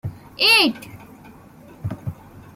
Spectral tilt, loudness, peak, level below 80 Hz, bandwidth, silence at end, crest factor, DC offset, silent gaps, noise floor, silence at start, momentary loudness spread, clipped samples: -3.5 dB/octave; -15 LUFS; -4 dBFS; -54 dBFS; 16.5 kHz; 0.15 s; 20 dB; under 0.1%; none; -45 dBFS; 0.05 s; 22 LU; under 0.1%